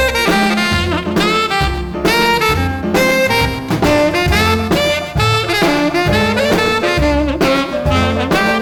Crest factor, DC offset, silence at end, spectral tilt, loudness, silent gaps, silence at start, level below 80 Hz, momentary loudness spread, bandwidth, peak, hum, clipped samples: 12 dB; under 0.1%; 0 s; -5 dB/octave; -14 LUFS; none; 0 s; -28 dBFS; 3 LU; over 20 kHz; -2 dBFS; none; under 0.1%